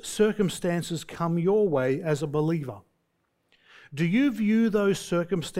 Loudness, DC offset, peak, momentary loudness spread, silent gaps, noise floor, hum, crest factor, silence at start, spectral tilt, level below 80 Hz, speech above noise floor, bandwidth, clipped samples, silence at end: -26 LUFS; under 0.1%; -10 dBFS; 7 LU; none; -74 dBFS; none; 16 dB; 0.05 s; -6 dB/octave; -58 dBFS; 49 dB; 16 kHz; under 0.1%; 0 s